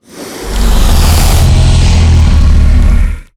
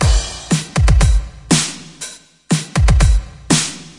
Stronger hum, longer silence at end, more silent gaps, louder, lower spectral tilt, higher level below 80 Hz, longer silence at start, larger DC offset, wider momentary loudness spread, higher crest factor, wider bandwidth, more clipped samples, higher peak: neither; about the same, 0.15 s vs 0.1 s; neither; first, -9 LUFS vs -16 LUFS; about the same, -5 dB/octave vs -4 dB/octave; first, -8 dBFS vs -18 dBFS; about the same, 0 s vs 0 s; neither; second, 8 LU vs 13 LU; second, 6 dB vs 14 dB; first, 16 kHz vs 11.5 kHz; neither; about the same, 0 dBFS vs 0 dBFS